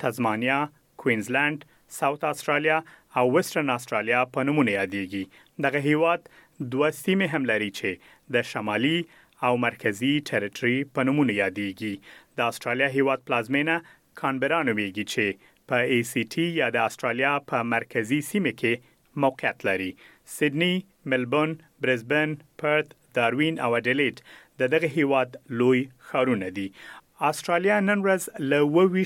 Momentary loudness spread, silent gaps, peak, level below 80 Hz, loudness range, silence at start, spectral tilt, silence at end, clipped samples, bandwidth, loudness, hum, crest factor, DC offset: 8 LU; none; -8 dBFS; -72 dBFS; 2 LU; 0 s; -5.5 dB/octave; 0 s; under 0.1%; 17 kHz; -25 LUFS; none; 18 dB; under 0.1%